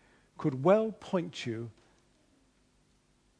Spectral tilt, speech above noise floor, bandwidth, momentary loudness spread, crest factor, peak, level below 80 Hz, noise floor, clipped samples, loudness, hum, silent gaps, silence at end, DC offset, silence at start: -7 dB/octave; 39 dB; 10.5 kHz; 14 LU; 24 dB; -10 dBFS; -72 dBFS; -69 dBFS; under 0.1%; -31 LUFS; 50 Hz at -70 dBFS; none; 1.7 s; under 0.1%; 0.4 s